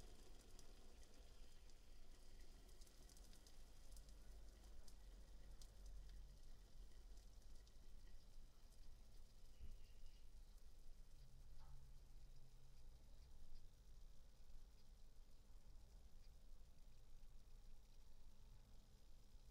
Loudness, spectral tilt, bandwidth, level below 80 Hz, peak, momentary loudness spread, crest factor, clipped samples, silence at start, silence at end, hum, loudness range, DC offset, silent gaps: -68 LUFS; -4 dB/octave; 15.5 kHz; -62 dBFS; -46 dBFS; 4 LU; 14 dB; under 0.1%; 0 s; 0 s; none; 3 LU; under 0.1%; none